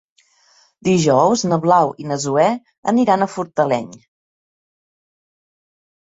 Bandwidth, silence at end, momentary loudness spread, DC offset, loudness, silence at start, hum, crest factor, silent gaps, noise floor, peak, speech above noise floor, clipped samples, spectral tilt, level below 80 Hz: 8 kHz; 2.15 s; 9 LU; under 0.1%; -17 LUFS; 0.85 s; none; 18 dB; 2.78-2.83 s; -55 dBFS; -2 dBFS; 39 dB; under 0.1%; -5.5 dB/octave; -60 dBFS